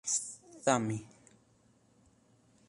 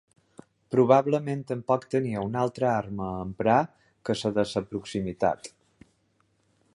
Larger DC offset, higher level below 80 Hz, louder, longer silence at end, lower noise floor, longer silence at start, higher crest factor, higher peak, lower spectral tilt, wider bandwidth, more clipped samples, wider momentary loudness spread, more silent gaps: neither; second, -74 dBFS vs -58 dBFS; second, -34 LUFS vs -27 LUFS; first, 1.65 s vs 1.25 s; about the same, -67 dBFS vs -69 dBFS; second, 0.05 s vs 0.7 s; about the same, 26 dB vs 22 dB; second, -12 dBFS vs -6 dBFS; second, -3.5 dB/octave vs -6.5 dB/octave; about the same, 11.5 kHz vs 11.5 kHz; neither; about the same, 14 LU vs 12 LU; neither